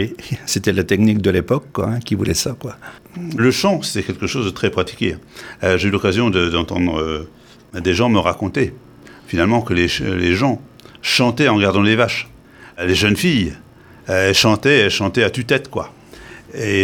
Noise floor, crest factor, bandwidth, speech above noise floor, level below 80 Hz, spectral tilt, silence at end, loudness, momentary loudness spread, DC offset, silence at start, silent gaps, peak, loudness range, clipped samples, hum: -39 dBFS; 18 dB; 19 kHz; 22 dB; -42 dBFS; -5 dB/octave; 0 s; -17 LUFS; 14 LU; under 0.1%; 0 s; none; 0 dBFS; 4 LU; under 0.1%; none